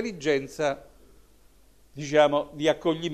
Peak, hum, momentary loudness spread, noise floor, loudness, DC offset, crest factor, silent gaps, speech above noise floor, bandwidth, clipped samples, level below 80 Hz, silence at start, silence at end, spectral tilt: -8 dBFS; none; 10 LU; -58 dBFS; -25 LUFS; 0.1%; 20 dB; none; 33 dB; 13 kHz; under 0.1%; -58 dBFS; 0 s; 0 s; -5 dB/octave